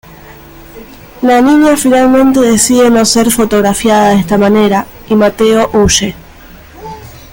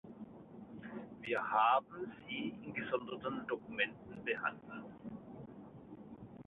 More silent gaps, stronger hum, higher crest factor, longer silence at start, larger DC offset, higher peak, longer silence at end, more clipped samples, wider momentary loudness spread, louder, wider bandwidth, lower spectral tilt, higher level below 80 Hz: neither; neither; second, 10 dB vs 22 dB; about the same, 0.1 s vs 0.05 s; neither; first, 0 dBFS vs -18 dBFS; about the same, 0.15 s vs 0.05 s; neither; second, 8 LU vs 21 LU; first, -8 LUFS vs -38 LUFS; first, 17 kHz vs 4 kHz; first, -4 dB/octave vs -2.5 dB/octave; first, -34 dBFS vs -74 dBFS